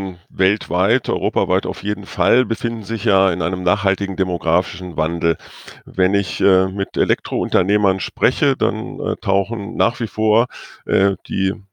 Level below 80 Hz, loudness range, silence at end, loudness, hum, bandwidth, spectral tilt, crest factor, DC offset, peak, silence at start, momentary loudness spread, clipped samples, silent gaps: -48 dBFS; 1 LU; 0.1 s; -19 LUFS; none; 10 kHz; -6.5 dB/octave; 18 dB; under 0.1%; 0 dBFS; 0 s; 8 LU; under 0.1%; none